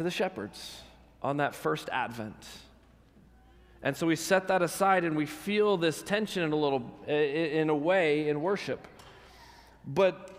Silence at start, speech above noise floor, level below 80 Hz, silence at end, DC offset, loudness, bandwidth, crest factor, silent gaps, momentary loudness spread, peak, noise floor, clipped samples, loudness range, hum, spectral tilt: 0 s; 29 dB; -64 dBFS; 0 s; under 0.1%; -29 LUFS; 16 kHz; 18 dB; none; 15 LU; -12 dBFS; -59 dBFS; under 0.1%; 7 LU; none; -5 dB/octave